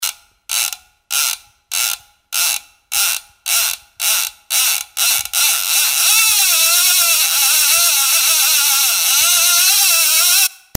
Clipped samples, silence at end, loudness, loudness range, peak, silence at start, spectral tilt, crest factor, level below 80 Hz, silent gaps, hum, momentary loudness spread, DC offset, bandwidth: under 0.1%; 0.2 s; -12 LUFS; 7 LU; 0 dBFS; 0 s; 4 dB/octave; 16 dB; -60 dBFS; none; none; 11 LU; under 0.1%; 16.5 kHz